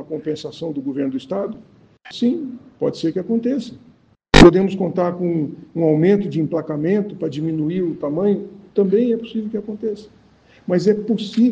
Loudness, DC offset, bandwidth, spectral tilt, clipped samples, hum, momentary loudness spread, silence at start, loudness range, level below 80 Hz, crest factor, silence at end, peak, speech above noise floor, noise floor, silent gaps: -19 LUFS; under 0.1%; 9.4 kHz; -6.5 dB/octave; under 0.1%; none; 11 LU; 0 s; 8 LU; -34 dBFS; 18 dB; 0 s; 0 dBFS; 31 dB; -51 dBFS; none